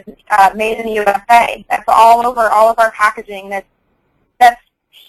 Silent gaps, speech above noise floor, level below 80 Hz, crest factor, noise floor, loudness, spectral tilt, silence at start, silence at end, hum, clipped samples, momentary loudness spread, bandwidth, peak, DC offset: none; 49 dB; -48 dBFS; 12 dB; -61 dBFS; -11 LUFS; -2.5 dB/octave; 0.1 s; 0.55 s; none; 0.2%; 15 LU; 15 kHz; 0 dBFS; under 0.1%